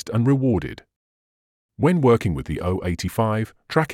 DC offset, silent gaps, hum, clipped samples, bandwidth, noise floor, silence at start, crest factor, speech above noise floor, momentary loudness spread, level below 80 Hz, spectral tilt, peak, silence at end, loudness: under 0.1%; 0.96-1.69 s; none; under 0.1%; 16.5 kHz; under -90 dBFS; 0.05 s; 18 dB; over 69 dB; 8 LU; -46 dBFS; -7.5 dB/octave; -4 dBFS; 0 s; -22 LUFS